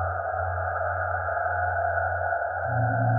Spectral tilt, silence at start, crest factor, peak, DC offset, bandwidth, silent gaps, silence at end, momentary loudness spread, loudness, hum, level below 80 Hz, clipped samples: -13 dB/octave; 0 s; 12 dB; -14 dBFS; under 0.1%; 2.2 kHz; none; 0 s; 3 LU; -27 LUFS; none; -48 dBFS; under 0.1%